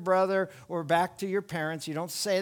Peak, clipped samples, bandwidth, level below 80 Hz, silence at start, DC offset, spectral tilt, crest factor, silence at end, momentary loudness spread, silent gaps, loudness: -10 dBFS; under 0.1%; 19.5 kHz; -70 dBFS; 0 s; under 0.1%; -4.5 dB/octave; 18 dB; 0 s; 9 LU; none; -30 LUFS